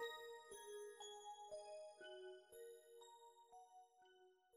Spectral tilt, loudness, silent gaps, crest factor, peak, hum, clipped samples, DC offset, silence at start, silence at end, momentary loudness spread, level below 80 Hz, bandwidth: -0.5 dB/octave; -58 LUFS; none; 20 dB; -40 dBFS; none; under 0.1%; under 0.1%; 0 s; 0 s; 10 LU; under -90 dBFS; 15 kHz